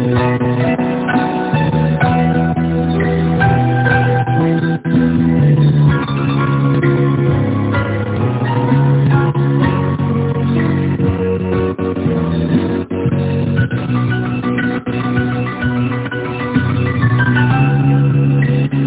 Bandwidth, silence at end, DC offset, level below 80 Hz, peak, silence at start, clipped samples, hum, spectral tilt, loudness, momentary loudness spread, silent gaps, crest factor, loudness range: 4 kHz; 0 s; under 0.1%; -32 dBFS; 0 dBFS; 0 s; under 0.1%; none; -12 dB/octave; -15 LUFS; 5 LU; none; 14 dB; 4 LU